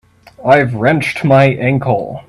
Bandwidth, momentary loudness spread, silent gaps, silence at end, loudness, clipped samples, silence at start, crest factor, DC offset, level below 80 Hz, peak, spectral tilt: 12 kHz; 6 LU; none; 0.1 s; -12 LUFS; under 0.1%; 0.4 s; 12 dB; under 0.1%; -48 dBFS; 0 dBFS; -7.5 dB/octave